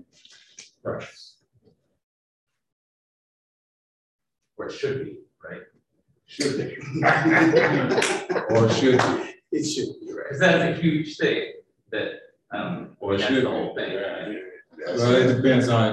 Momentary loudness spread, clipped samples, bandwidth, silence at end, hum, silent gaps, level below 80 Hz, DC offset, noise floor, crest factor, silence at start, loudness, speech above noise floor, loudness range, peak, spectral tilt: 19 LU; under 0.1%; 12 kHz; 0 s; none; 2.03-2.47 s, 2.72-4.19 s; -58 dBFS; under 0.1%; -69 dBFS; 18 dB; 0.6 s; -23 LUFS; 47 dB; 16 LU; -6 dBFS; -5.5 dB/octave